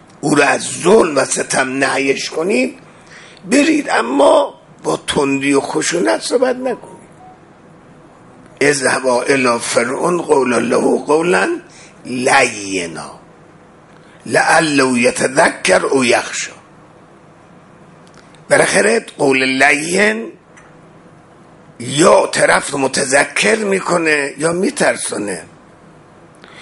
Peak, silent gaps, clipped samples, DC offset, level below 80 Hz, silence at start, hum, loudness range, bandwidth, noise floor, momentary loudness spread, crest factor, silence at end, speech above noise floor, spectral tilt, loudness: 0 dBFS; none; under 0.1%; under 0.1%; -54 dBFS; 0.25 s; none; 4 LU; 11.5 kHz; -43 dBFS; 11 LU; 16 dB; 0 s; 29 dB; -3.5 dB/octave; -14 LUFS